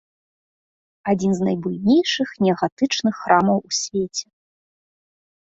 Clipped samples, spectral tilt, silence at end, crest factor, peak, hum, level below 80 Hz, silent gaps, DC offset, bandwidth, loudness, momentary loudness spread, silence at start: under 0.1%; -4.5 dB/octave; 1.25 s; 20 dB; -2 dBFS; none; -60 dBFS; 2.72-2.77 s; under 0.1%; 8 kHz; -20 LUFS; 7 LU; 1.05 s